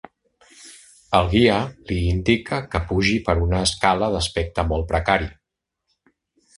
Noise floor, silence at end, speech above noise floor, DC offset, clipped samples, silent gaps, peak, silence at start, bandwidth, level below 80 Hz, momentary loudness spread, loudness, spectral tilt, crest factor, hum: -81 dBFS; 1.25 s; 61 dB; under 0.1%; under 0.1%; none; 0 dBFS; 0.6 s; 11.5 kHz; -32 dBFS; 7 LU; -21 LUFS; -5 dB/octave; 22 dB; none